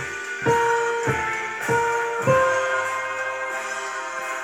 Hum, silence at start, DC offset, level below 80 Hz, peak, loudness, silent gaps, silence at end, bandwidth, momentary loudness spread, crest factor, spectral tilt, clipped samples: none; 0 s; under 0.1%; -54 dBFS; -6 dBFS; -23 LUFS; none; 0 s; 16.5 kHz; 9 LU; 18 dB; -4 dB/octave; under 0.1%